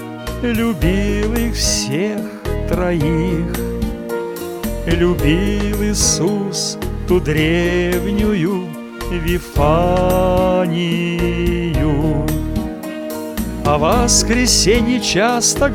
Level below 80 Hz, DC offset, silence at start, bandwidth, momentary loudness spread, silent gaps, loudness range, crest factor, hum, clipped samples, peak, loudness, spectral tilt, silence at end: -26 dBFS; under 0.1%; 0 s; 18 kHz; 11 LU; none; 3 LU; 16 dB; none; under 0.1%; 0 dBFS; -17 LUFS; -4.5 dB/octave; 0 s